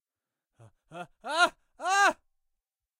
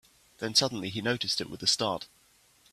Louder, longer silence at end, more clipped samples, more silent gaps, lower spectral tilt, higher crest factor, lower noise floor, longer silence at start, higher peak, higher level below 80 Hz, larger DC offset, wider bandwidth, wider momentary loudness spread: about the same, -27 LUFS vs -28 LUFS; first, 0.85 s vs 0.65 s; neither; neither; second, -1 dB/octave vs -2.5 dB/octave; about the same, 22 dB vs 22 dB; first, under -90 dBFS vs -64 dBFS; first, 0.9 s vs 0.4 s; about the same, -10 dBFS vs -10 dBFS; second, -72 dBFS vs -66 dBFS; neither; about the same, 16 kHz vs 15 kHz; first, 21 LU vs 13 LU